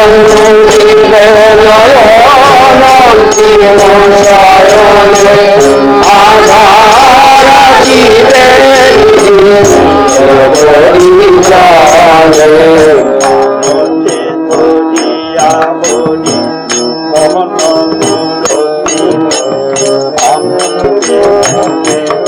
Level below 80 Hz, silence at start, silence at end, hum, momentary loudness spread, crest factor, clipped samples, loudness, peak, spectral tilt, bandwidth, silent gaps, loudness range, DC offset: -30 dBFS; 0 s; 0 s; none; 8 LU; 4 dB; 30%; -4 LUFS; 0 dBFS; -3.5 dB/octave; over 20 kHz; none; 7 LU; 0.9%